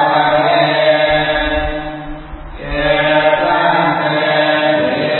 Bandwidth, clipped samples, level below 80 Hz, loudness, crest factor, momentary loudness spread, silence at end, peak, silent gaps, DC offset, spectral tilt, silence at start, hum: 4.3 kHz; under 0.1%; -32 dBFS; -13 LUFS; 14 dB; 15 LU; 0 s; 0 dBFS; none; under 0.1%; -10 dB/octave; 0 s; none